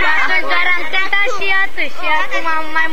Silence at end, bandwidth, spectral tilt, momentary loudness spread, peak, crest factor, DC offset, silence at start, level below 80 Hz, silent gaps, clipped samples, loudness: 0 s; 15.5 kHz; -3 dB/octave; 4 LU; 0 dBFS; 16 dB; 20%; 0 s; -50 dBFS; none; under 0.1%; -15 LUFS